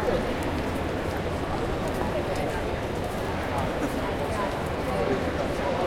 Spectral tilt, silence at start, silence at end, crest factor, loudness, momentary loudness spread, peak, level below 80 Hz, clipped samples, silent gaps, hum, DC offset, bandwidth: -6 dB/octave; 0 s; 0 s; 14 dB; -28 LUFS; 3 LU; -14 dBFS; -38 dBFS; under 0.1%; none; none; under 0.1%; 16.5 kHz